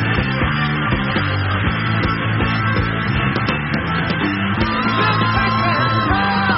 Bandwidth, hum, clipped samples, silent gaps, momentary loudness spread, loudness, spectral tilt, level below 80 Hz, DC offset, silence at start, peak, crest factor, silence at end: 5.8 kHz; none; under 0.1%; none; 3 LU; -17 LUFS; -4 dB/octave; -32 dBFS; under 0.1%; 0 s; -4 dBFS; 14 dB; 0 s